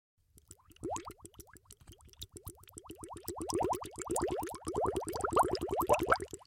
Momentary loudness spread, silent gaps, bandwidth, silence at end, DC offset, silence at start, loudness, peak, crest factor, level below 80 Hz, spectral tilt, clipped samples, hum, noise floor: 22 LU; none; 16.5 kHz; 0.1 s; under 0.1%; 0.5 s; -35 LUFS; -12 dBFS; 24 dB; -56 dBFS; -4.5 dB/octave; under 0.1%; none; -61 dBFS